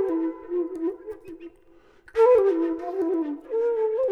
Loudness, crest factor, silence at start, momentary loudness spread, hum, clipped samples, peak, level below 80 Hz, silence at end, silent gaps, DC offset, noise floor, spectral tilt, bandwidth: -24 LUFS; 16 dB; 0 s; 21 LU; none; under 0.1%; -8 dBFS; -62 dBFS; 0 s; none; under 0.1%; -55 dBFS; -6.5 dB/octave; 6.6 kHz